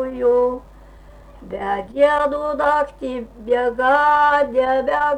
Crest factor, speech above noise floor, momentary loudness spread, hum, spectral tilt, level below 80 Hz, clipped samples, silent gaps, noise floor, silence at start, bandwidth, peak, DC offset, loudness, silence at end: 14 dB; 25 dB; 14 LU; none; -5 dB/octave; -46 dBFS; under 0.1%; none; -43 dBFS; 0 s; 9.8 kHz; -4 dBFS; under 0.1%; -18 LUFS; 0 s